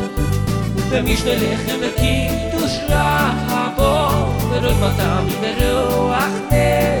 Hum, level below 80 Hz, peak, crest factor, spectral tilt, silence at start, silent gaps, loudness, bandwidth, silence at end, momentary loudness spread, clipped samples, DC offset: none; -26 dBFS; -2 dBFS; 16 dB; -5.5 dB/octave; 0 s; none; -18 LUFS; 19 kHz; 0 s; 4 LU; under 0.1%; under 0.1%